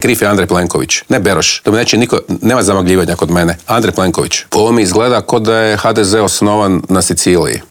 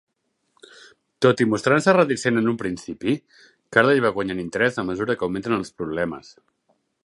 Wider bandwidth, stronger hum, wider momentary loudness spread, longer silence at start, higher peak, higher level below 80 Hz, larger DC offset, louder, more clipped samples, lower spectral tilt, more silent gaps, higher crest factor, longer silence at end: first, 20 kHz vs 11.5 kHz; neither; second, 3 LU vs 11 LU; second, 0 s vs 1.2 s; about the same, 0 dBFS vs 0 dBFS; first, -42 dBFS vs -56 dBFS; neither; first, -11 LUFS vs -21 LUFS; neither; second, -4 dB/octave vs -5.5 dB/octave; neither; second, 10 dB vs 22 dB; second, 0.1 s vs 0.85 s